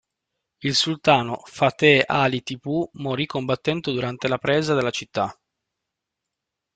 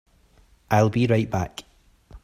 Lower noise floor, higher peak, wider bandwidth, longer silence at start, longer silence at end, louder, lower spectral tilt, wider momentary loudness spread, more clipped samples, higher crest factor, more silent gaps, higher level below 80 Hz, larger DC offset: first, -84 dBFS vs -57 dBFS; about the same, -2 dBFS vs -4 dBFS; second, 9.2 kHz vs 15 kHz; about the same, 0.6 s vs 0.7 s; first, 1.45 s vs 0.05 s; about the same, -22 LUFS vs -23 LUFS; second, -5 dB/octave vs -7 dB/octave; second, 10 LU vs 13 LU; neither; about the same, 20 dB vs 20 dB; neither; second, -60 dBFS vs -50 dBFS; neither